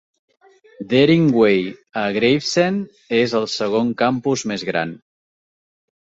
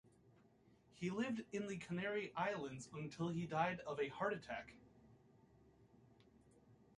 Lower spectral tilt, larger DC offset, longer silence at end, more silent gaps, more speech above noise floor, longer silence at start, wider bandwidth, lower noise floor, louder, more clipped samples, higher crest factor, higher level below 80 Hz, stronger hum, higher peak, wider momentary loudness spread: about the same, -5.5 dB/octave vs -6 dB/octave; neither; first, 1.15 s vs 0.2 s; neither; first, over 72 dB vs 28 dB; first, 0.8 s vs 0.3 s; second, 8 kHz vs 11.5 kHz; first, under -90 dBFS vs -71 dBFS; first, -18 LUFS vs -44 LUFS; neither; about the same, 18 dB vs 22 dB; first, -58 dBFS vs -76 dBFS; neither; first, -2 dBFS vs -24 dBFS; about the same, 10 LU vs 10 LU